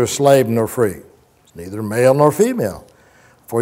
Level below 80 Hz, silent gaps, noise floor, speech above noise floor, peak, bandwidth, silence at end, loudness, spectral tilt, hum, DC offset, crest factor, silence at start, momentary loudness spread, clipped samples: -52 dBFS; none; -50 dBFS; 35 dB; 0 dBFS; 16 kHz; 0 s; -16 LUFS; -5.5 dB/octave; none; under 0.1%; 16 dB; 0 s; 21 LU; under 0.1%